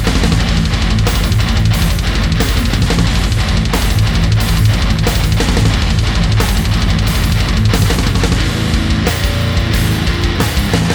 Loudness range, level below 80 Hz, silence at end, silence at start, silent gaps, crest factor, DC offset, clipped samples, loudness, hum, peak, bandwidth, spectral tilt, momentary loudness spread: 1 LU; -16 dBFS; 0 s; 0 s; none; 12 dB; under 0.1%; under 0.1%; -14 LUFS; none; 0 dBFS; over 20 kHz; -5 dB/octave; 2 LU